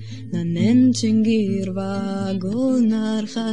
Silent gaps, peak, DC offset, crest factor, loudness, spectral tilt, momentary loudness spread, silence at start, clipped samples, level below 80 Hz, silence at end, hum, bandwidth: none; -8 dBFS; 0.8%; 12 dB; -20 LUFS; -6.5 dB/octave; 9 LU; 0 s; under 0.1%; -64 dBFS; 0 s; none; 10.5 kHz